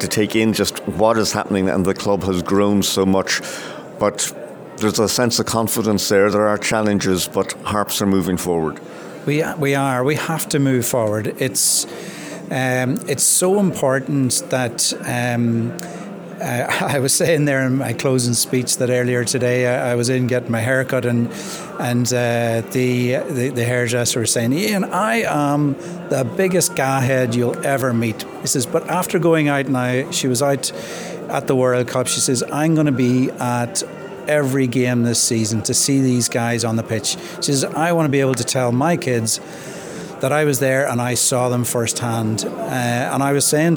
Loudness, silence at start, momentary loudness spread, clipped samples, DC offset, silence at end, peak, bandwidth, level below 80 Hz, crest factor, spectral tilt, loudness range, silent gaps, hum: -18 LUFS; 0 s; 7 LU; under 0.1%; under 0.1%; 0 s; -2 dBFS; over 20 kHz; -54 dBFS; 16 dB; -4 dB/octave; 2 LU; none; none